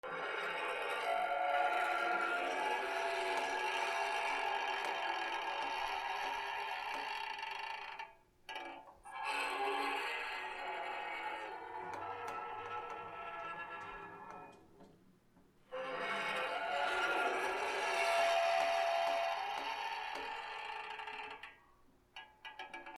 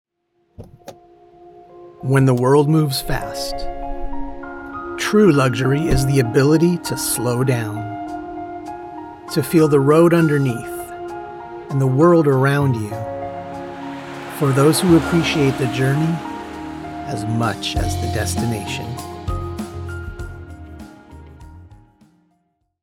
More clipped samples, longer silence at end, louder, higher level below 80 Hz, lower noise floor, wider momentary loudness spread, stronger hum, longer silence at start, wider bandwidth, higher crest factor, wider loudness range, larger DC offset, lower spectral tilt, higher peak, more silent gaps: neither; second, 0 s vs 1.05 s; second, -38 LUFS vs -18 LUFS; second, -74 dBFS vs -36 dBFS; about the same, -67 dBFS vs -67 dBFS; second, 15 LU vs 18 LU; neither; second, 0.05 s vs 0.6 s; about the same, 16 kHz vs 16.5 kHz; about the same, 18 dB vs 16 dB; about the same, 10 LU vs 9 LU; neither; second, -1.5 dB/octave vs -6 dB/octave; second, -22 dBFS vs -2 dBFS; neither